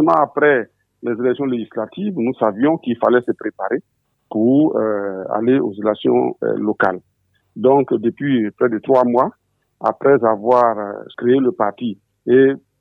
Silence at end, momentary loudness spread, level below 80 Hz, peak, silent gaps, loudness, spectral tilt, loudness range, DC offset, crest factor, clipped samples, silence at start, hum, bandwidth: 0.25 s; 10 LU; -66 dBFS; 0 dBFS; none; -17 LUFS; -9 dB/octave; 3 LU; under 0.1%; 16 dB; under 0.1%; 0 s; none; 4.9 kHz